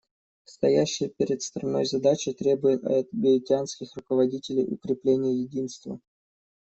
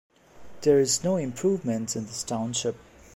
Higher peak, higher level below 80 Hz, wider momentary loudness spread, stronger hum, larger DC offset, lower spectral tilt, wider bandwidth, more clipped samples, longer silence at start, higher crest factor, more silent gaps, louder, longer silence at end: about the same, -10 dBFS vs -8 dBFS; second, -66 dBFS vs -60 dBFS; about the same, 11 LU vs 10 LU; neither; neither; about the same, -5.5 dB/octave vs -4.5 dB/octave; second, 8.2 kHz vs 16 kHz; neither; first, 0.6 s vs 0.35 s; about the same, 16 dB vs 18 dB; neither; about the same, -26 LUFS vs -26 LUFS; first, 0.65 s vs 0.4 s